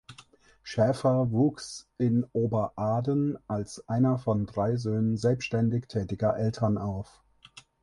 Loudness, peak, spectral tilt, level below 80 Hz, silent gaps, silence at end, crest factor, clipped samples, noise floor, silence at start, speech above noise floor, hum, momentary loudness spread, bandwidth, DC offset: -28 LUFS; -12 dBFS; -7.5 dB/octave; -54 dBFS; none; 0.25 s; 16 dB; under 0.1%; -56 dBFS; 0.1 s; 29 dB; none; 9 LU; 11.5 kHz; under 0.1%